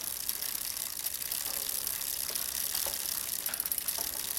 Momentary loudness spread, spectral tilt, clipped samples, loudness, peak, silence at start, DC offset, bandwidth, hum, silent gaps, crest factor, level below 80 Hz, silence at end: 3 LU; 1 dB/octave; under 0.1%; -32 LUFS; -12 dBFS; 0 s; under 0.1%; 17 kHz; none; none; 24 dB; -62 dBFS; 0 s